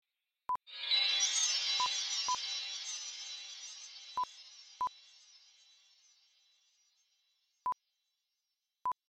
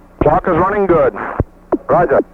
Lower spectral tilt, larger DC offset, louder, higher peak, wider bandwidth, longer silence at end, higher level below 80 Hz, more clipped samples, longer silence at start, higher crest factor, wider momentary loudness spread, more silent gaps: second, 4 dB/octave vs -10 dB/octave; neither; second, -34 LUFS vs -14 LUFS; second, -20 dBFS vs 0 dBFS; first, 13.5 kHz vs 6.2 kHz; about the same, 0.15 s vs 0.1 s; second, -84 dBFS vs -32 dBFS; neither; first, 0.5 s vs 0.2 s; first, 20 dB vs 14 dB; first, 17 LU vs 9 LU; neither